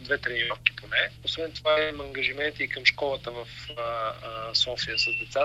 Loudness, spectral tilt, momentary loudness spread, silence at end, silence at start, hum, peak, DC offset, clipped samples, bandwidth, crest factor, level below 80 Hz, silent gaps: -26 LUFS; -2.5 dB/octave; 11 LU; 0 s; 0 s; none; -2 dBFS; under 0.1%; under 0.1%; 13.5 kHz; 26 dB; -52 dBFS; none